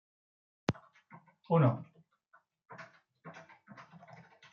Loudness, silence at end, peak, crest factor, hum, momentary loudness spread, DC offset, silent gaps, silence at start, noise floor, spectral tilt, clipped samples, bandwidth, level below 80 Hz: -33 LUFS; 0.7 s; -14 dBFS; 24 dB; none; 27 LU; under 0.1%; none; 0.7 s; -70 dBFS; -7.5 dB/octave; under 0.1%; 7.2 kHz; -74 dBFS